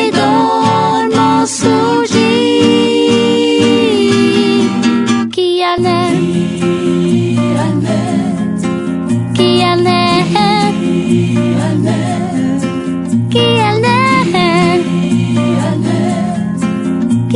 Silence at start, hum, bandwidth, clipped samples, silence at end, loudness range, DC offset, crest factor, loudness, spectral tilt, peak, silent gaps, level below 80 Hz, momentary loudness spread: 0 s; none; 11 kHz; under 0.1%; 0 s; 3 LU; under 0.1%; 12 dB; -12 LUFS; -5.5 dB/octave; 0 dBFS; none; -50 dBFS; 5 LU